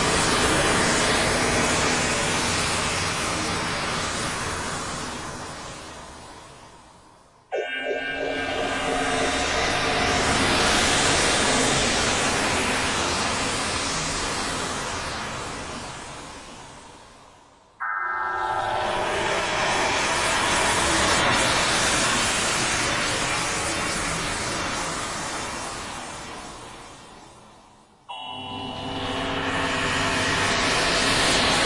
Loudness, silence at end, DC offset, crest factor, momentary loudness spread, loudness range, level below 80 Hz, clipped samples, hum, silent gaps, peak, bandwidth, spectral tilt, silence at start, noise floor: -23 LUFS; 0 s; under 0.1%; 16 dB; 15 LU; 13 LU; -42 dBFS; under 0.1%; none; none; -8 dBFS; 12 kHz; -2.5 dB/octave; 0 s; -53 dBFS